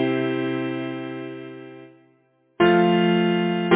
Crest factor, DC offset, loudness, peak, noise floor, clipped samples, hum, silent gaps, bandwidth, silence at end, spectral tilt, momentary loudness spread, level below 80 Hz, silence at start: 18 dB; under 0.1%; -21 LUFS; -4 dBFS; -62 dBFS; under 0.1%; none; none; 4 kHz; 0 s; -10.5 dB/octave; 20 LU; -62 dBFS; 0 s